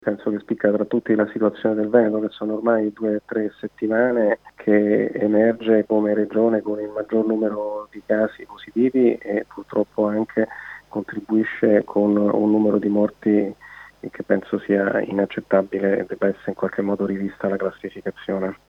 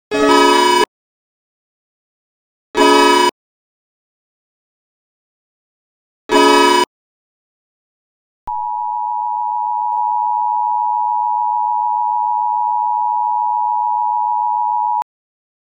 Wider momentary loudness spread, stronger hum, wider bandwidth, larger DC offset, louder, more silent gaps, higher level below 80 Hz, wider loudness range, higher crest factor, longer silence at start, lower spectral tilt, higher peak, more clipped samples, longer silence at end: about the same, 11 LU vs 10 LU; neither; second, 5.4 kHz vs 17 kHz; neither; second, -21 LUFS vs -15 LUFS; second, none vs 0.88-2.74 s, 3.32-6.29 s, 6.87-8.47 s; second, -64 dBFS vs -56 dBFS; about the same, 3 LU vs 4 LU; about the same, 18 dB vs 16 dB; about the same, 0.05 s vs 0.1 s; first, -9 dB/octave vs -1.5 dB/octave; about the same, -2 dBFS vs 0 dBFS; neither; second, 0.15 s vs 0.6 s